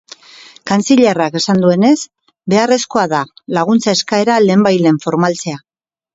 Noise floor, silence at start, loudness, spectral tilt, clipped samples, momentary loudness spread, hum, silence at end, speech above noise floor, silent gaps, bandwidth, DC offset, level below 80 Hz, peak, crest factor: -40 dBFS; 0.65 s; -13 LUFS; -5 dB/octave; under 0.1%; 11 LU; none; 0.55 s; 28 dB; none; 8 kHz; under 0.1%; -58 dBFS; 0 dBFS; 14 dB